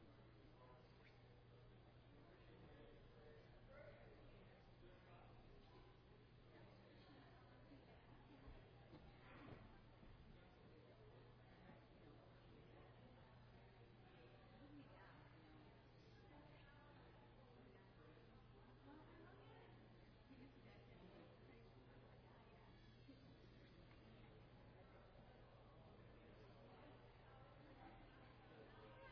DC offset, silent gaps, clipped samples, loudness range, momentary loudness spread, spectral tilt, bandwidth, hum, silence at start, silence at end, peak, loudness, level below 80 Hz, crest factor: under 0.1%; none; under 0.1%; 2 LU; 3 LU; -5.5 dB/octave; 5.2 kHz; none; 0 s; 0 s; -48 dBFS; -67 LUFS; -74 dBFS; 18 dB